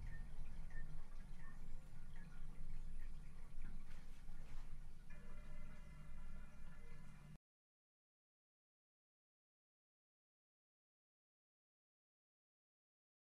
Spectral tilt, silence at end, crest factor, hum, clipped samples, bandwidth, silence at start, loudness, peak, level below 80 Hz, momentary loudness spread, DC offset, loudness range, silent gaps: -6 dB/octave; 6 s; 14 dB; none; under 0.1%; 4.1 kHz; 0 s; -60 LUFS; -34 dBFS; -52 dBFS; 5 LU; under 0.1%; 7 LU; none